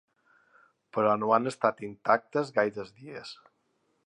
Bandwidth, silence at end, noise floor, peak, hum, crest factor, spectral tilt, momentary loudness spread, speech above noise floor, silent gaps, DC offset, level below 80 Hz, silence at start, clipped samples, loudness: 10.5 kHz; 0.7 s; -74 dBFS; -8 dBFS; none; 22 dB; -6 dB/octave; 17 LU; 46 dB; none; under 0.1%; -76 dBFS; 0.95 s; under 0.1%; -28 LUFS